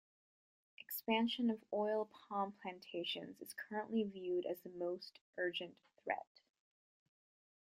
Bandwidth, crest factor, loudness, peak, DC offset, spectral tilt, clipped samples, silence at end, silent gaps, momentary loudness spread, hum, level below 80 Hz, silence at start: 15.5 kHz; 22 dB; -42 LUFS; -22 dBFS; under 0.1%; -4.5 dB/octave; under 0.1%; 1.4 s; 5.21-5.33 s; 13 LU; none; -88 dBFS; 0.9 s